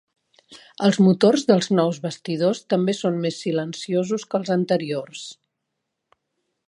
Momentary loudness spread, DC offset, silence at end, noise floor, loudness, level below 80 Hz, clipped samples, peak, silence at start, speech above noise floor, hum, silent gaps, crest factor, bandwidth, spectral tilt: 12 LU; under 0.1%; 1.35 s; -79 dBFS; -21 LUFS; -70 dBFS; under 0.1%; -2 dBFS; 0.5 s; 58 dB; none; none; 20 dB; 11 kHz; -6 dB/octave